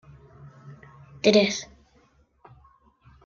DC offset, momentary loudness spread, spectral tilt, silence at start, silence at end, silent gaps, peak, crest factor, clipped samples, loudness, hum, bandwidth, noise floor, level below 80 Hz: under 0.1%; 28 LU; -4 dB/octave; 0.65 s; 1.6 s; none; -4 dBFS; 24 dB; under 0.1%; -22 LUFS; none; 7.4 kHz; -62 dBFS; -62 dBFS